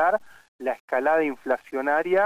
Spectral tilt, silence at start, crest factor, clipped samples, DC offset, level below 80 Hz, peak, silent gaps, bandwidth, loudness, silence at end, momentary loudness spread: -6 dB/octave; 0 s; 14 dB; under 0.1%; under 0.1%; -70 dBFS; -10 dBFS; 0.48-0.59 s, 0.80-0.88 s; 15 kHz; -25 LUFS; 0 s; 9 LU